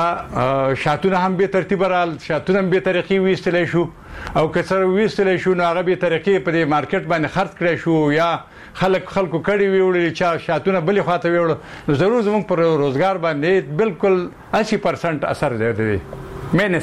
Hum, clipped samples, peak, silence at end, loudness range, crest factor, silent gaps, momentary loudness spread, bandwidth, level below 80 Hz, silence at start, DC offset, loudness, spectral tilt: none; under 0.1%; -4 dBFS; 0 s; 1 LU; 14 dB; none; 5 LU; 11 kHz; -46 dBFS; 0 s; 0.2%; -18 LUFS; -7 dB/octave